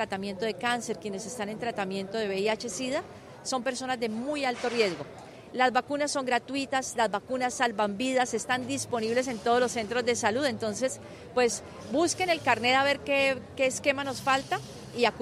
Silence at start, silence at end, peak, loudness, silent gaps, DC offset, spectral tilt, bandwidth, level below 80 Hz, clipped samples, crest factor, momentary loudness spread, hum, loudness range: 0 s; 0 s; -10 dBFS; -28 LUFS; none; under 0.1%; -3 dB/octave; 15 kHz; -66 dBFS; under 0.1%; 20 dB; 9 LU; none; 5 LU